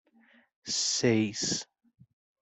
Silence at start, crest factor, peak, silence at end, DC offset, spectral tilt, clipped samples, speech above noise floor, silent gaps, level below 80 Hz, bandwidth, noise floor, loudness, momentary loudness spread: 0.65 s; 20 dB; -12 dBFS; 0.8 s; under 0.1%; -3 dB/octave; under 0.1%; 35 dB; none; -68 dBFS; 8.4 kHz; -63 dBFS; -28 LUFS; 17 LU